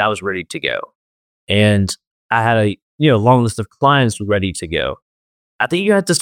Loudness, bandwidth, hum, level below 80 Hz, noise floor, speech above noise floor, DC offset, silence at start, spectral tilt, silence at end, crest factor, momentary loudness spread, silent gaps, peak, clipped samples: -16 LUFS; 16.5 kHz; none; -48 dBFS; under -90 dBFS; over 75 dB; under 0.1%; 0 s; -5 dB/octave; 0 s; 16 dB; 9 LU; 0.95-1.47 s, 2.07-2.29 s, 2.82-2.98 s, 5.02-5.59 s; 0 dBFS; under 0.1%